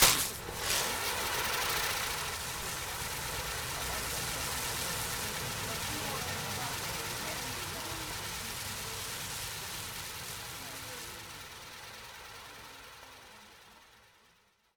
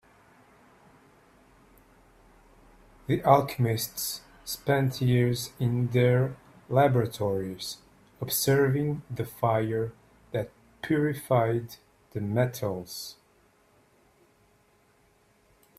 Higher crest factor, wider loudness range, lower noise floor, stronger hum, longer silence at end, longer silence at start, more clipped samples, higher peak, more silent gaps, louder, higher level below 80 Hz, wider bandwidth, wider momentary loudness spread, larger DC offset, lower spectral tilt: first, 30 dB vs 24 dB; first, 12 LU vs 9 LU; first, -68 dBFS vs -64 dBFS; neither; second, 0.7 s vs 2.65 s; second, 0 s vs 3.1 s; neither; about the same, -8 dBFS vs -6 dBFS; neither; second, -35 LUFS vs -27 LUFS; first, -54 dBFS vs -60 dBFS; first, over 20 kHz vs 16 kHz; about the same, 16 LU vs 15 LU; neither; second, -1.5 dB/octave vs -6 dB/octave